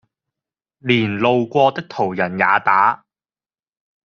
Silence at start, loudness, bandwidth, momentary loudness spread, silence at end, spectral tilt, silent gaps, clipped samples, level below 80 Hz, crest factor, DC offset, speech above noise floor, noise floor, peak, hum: 0.85 s; -17 LUFS; 7 kHz; 8 LU; 1.1 s; -3.5 dB/octave; none; under 0.1%; -62 dBFS; 18 dB; under 0.1%; over 73 dB; under -90 dBFS; -2 dBFS; none